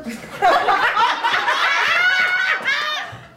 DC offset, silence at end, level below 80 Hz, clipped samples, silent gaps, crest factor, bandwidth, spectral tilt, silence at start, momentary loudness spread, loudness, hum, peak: under 0.1%; 0.1 s; -58 dBFS; under 0.1%; none; 16 dB; 16.5 kHz; -1.5 dB/octave; 0 s; 6 LU; -17 LUFS; none; -2 dBFS